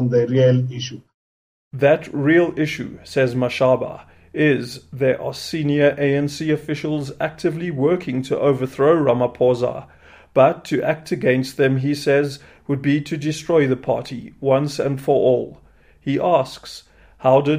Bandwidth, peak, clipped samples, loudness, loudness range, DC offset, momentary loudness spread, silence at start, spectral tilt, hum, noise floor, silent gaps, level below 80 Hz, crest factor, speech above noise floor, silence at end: 15.5 kHz; -2 dBFS; under 0.1%; -19 LUFS; 2 LU; under 0.1%; 12 LU; 0 s; -7 dB/octave; none; under -90 dBFS; 1.14-1.71 s; -54 dBFS; 18 dB; over 71 dB; 0 s